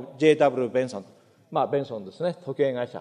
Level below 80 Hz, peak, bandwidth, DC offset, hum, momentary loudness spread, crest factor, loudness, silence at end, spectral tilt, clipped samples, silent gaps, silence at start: -74 dBFS; -6 dBFS; 10 kHz; under 0.1%; none; 12 LU; 20 dB; -25 LUFS; 0 s; -6.5 dB/octave; under 0.1%; none; 0 s